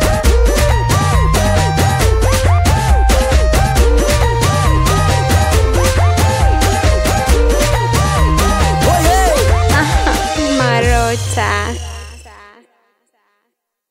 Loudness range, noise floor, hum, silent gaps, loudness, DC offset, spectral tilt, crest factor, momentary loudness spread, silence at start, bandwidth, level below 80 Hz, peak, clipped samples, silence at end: 3 LU; -71 dBFS; none; none; -13 LUFS; under 0.1%; -5 dB/octave; 12 dB; 3 LU; 0 s; 16.5 kHz; -16 dBFS; 0 dBFS; under 0.1%; 1.65 s